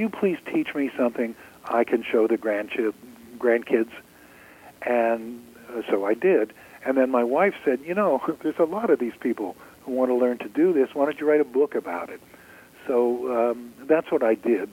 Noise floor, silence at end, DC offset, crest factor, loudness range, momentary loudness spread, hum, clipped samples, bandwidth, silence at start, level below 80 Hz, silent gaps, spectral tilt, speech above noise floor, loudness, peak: -50 dBFS; 0 s; under 0.1%; 18 dB; 3 LU; 12 LU; none; under 0.1%; 17 kHz; 0 s; -68 dBFS; none; -6.5 dB/octave; 26 dB; -24 LUFS; -6 dBFS